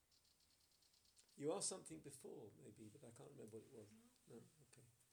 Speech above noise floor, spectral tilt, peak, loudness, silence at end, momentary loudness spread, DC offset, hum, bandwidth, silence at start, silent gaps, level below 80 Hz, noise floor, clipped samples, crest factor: 24 dB; -3.5 dB/octave; -34 dBFS; -53 LUFS; 0.05 s; 19 LU; under 0.1%; none; over 20 kHz; 0.1 s; none; -90 dBFS; -79 dBFS; under 0.1%; 22 dB